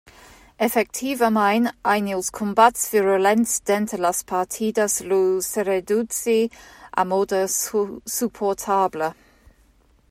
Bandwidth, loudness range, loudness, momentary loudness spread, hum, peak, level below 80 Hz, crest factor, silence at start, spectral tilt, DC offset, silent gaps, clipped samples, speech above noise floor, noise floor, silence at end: 16 kHz; 4 LU; -21 LUFS; 7 LU; none; -2 dBFS; -58 dBFS; 20 dB; 0.6 s; -3.5 dB/octave; under 0.1%; none; under 0.1%; 36 dB; -57 dBFS; 1 s